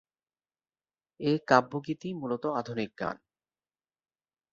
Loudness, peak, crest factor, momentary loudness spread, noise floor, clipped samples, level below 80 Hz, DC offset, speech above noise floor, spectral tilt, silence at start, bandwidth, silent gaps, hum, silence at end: -30 LUFS; -6 dBFS; 26 dB; 12 LU; under -90 dBFS; under 0.1%; -70 dBFS; under 0.1%; over 60 dB; -6.5 dB/octave; 1.2 s; 7.6 kHz; none; none; 1.35 s